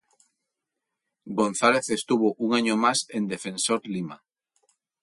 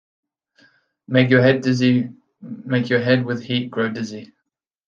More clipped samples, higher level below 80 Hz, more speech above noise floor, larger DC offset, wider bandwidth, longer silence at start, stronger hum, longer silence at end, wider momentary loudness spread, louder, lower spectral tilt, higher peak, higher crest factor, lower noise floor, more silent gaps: neither; second, -70 dBFS vs -64 dBFS; about the same, 60 dB vs 60 dB; neither; first, 11.5 kHz vs 7.2 kHz; first, 1.25 s vs 1.1 s; neither; first, 0.85 s vs 0.65 s; second, 11 LU vs 17 LU; second, -25 LUFS vs -19 LUFS; second, -3.5 dB/octave vs -7 dB/octave; second, -4 dBFS vs 0 dBFS; about the same, 22 dB vs 20 dB; first, -84 dBFS vs -78 dBFS; neither